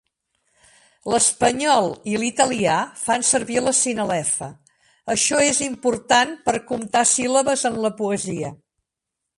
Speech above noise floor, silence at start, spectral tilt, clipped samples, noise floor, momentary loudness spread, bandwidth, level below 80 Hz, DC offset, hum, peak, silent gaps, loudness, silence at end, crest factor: 62 dB; 1.05 s; -2.5 dB/octave; under 0.1%; -83 dBFS; 8 LU; 11.5 kHz; -56 dBFS; under 0.1%; none; -2 dBFS; none; -20 LUFS; 0.85 s; 18 dB